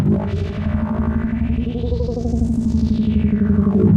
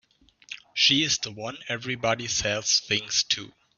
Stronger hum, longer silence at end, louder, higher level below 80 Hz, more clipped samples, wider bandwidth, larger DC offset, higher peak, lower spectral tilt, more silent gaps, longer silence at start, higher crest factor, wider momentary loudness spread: neither; second, 0 s vs 0.3 s; first, -19 LUFS vs -24 LUFS; first, -28 dBFS vs -58 dBFS; neither; about the same, 7.8 kHz vs 7.4 kHz; neither; first, -4 dBFS vs -8 dBFS; first, -9.5 dB/octave vs -1.5 dB/octave; neither; second, 0 s vs 0.5 s; second, 14 dB vs 20 dB; second, 6 LU vs 14 LU